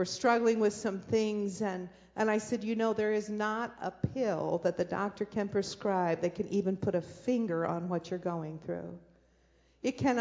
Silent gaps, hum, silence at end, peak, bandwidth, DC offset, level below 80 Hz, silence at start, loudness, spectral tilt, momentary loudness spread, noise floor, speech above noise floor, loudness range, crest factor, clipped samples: none; none; 0 s; -14 dBFS; 8 kHz; under 0.1%; -62 dBFS; 0 s; -33 LUFS; -6 dB/octave; 9 LU; -67 dBFS; 35 dB; 3 LU; 18 dB; under 0.1%